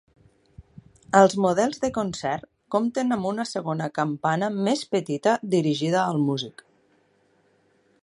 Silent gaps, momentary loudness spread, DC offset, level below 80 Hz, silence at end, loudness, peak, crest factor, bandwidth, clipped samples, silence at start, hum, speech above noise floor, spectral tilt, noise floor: none; 9 LU; under 0.1%; -62 dBFS; 1.5 s; -24 LUFS; -2 dBFS; 24 dB; 11.5 kHz; under 0.1%; 0.6 s; none; 41 dB; -5.5 dB/octave; -64 dBFS